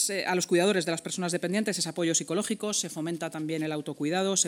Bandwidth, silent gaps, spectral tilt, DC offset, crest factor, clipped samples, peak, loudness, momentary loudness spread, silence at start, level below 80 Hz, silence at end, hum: 18.5 kHz; none; -3 dB/octave; under 0.1%; 20 dB; under 0.1%; -10 dBFS; -28 LUFS; 8 LU; 0 s; -80 dBFS; 0 s; none